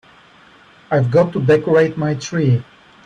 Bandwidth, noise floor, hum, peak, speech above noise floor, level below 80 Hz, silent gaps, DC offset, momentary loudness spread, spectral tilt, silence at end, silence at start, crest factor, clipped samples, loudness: 8.6 kHz; -47 dBFS; none; -4 dBFS; 32 dB; -54 dBFS; none; under 0.1%; 7 LU; -7 dB/octave; 0.45 s; 0.9 s; 14 dB; under 0.1%; -16 LUFS